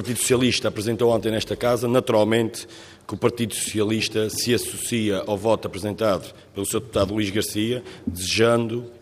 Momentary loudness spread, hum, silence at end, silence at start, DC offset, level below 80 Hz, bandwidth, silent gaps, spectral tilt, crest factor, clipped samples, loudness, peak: 9 LU; none; 0.05 s; 0 s; under 0.1%; -54 dBFS; 15.5 kHz; none; -4.5 dB/octave; 18 dB; under 0.1%; -23 LUFS; -6 dBFS